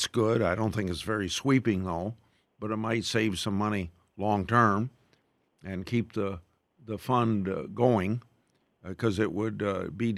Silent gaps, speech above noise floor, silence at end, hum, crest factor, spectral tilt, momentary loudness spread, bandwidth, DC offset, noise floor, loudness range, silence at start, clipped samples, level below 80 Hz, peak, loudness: none; 42 dB; 0 s; none; 20 dB; -6 dB/octave; 13 LU; 14 kHz; under 0.1%; -70 dBFS; 2 LU; 0 s; under 0.1%; -58 dBFS; -8 dBFS; -29 LUFS